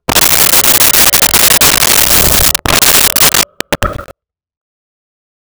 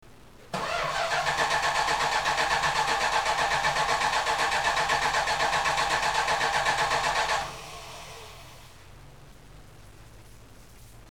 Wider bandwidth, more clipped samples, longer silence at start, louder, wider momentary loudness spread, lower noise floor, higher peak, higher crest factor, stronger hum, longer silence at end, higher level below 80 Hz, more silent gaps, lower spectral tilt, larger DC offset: about the same, over 20 kHz vs 18.5 kHz; neither; about the same, 0.1 s vs 0.05 s; first, -5 LUFS vs -25 LUFS; second, 11 LU vs 15 LU; second, -40 dBFS vs -51 dBFS; first, 0 dBFS vs -12 dBFS; second, 10 dB vs 16 dB; neither; first, 1.55 s vs 0 s; first, -28 dBFS vs -50 dBFS; neither; about the same, -0.5 dB/octave vs -1.5 dB/octave; second, under 0.1% vs 0.2%